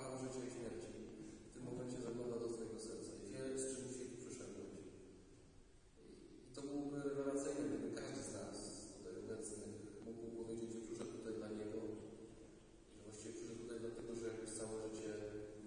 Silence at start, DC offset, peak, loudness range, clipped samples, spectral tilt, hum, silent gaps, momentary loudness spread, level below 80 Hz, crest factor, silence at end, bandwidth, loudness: 0 s; under 0.1%; -30 dBFS; 4 LU; under 0.1%; -5 dB/octave; none; none; 16 LU; -68 dBFS; 18 dB; 0 s; 10.5 kHz; -49 LUFS